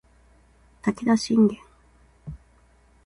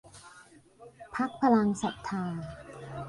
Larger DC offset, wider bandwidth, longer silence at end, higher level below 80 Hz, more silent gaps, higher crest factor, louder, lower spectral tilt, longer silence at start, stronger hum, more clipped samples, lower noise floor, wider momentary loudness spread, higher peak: neither; about the same, 11.5 kHz vs 11.5 kHz; first, 0.7 s vs 0 s; first, -54 dBFS vs -60 dBFS; neither; about the same, 18 dB vs 18 dB; first, -23 LUFS vs -30 LUFS; about the same, -6 dB/octave vs -6.5 dB/octave; first, 0.85 s vs 0.05 s; neither; neither; about the same, -58 dBFS vs -56 dBFS; about the same, 24 LU vs 25 LU; first, -8 dBFS vs -12 dBFS